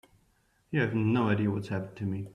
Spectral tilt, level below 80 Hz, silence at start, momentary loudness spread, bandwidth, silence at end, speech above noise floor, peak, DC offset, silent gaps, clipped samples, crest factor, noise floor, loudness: -8.5 dB/octave; -64 dBFS; 0.7 s; 9 LU; 9.8 kHz; 0 s; 40 dB; -14 dBFS; under 0.1%; none; under 0.1%; 16 dB; -69 dBFS; -30 LUFS